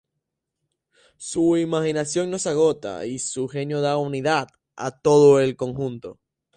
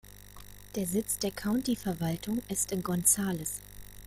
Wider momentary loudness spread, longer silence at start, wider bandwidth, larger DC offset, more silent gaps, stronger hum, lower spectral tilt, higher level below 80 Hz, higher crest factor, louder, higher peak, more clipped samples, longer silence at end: second, 16 LU vs 24 LU; first, 1.2 s vs 0.05 s; second, 10.5 kHz vs 16.5 kHz; neither; neither; second, none vs 50 Hz at -50 dBFS; about the same, -5 dB/octave vs -4 dB/octave; second, -60 dBFS vs -54 dBFS; about the same, 18 dB vs 22 dB; first, -22 LUFS vs -31 LUFS; first, -4 dBFS vs -10 dBFS; neither; first, 0.45 s vs 0 s